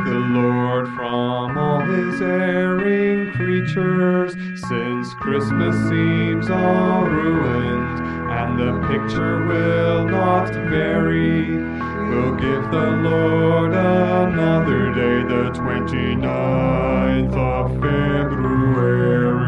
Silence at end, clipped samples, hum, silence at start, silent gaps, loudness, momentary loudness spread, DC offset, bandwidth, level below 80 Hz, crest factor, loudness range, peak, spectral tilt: 0 s; under 0.1%; none; 0 s; none; -19 LUFS; 6 LU; under 0.1%; 10 kHz; -36 dBFS; 14 dB; 2 LU; -4 dBFS; -8.5 dB/octave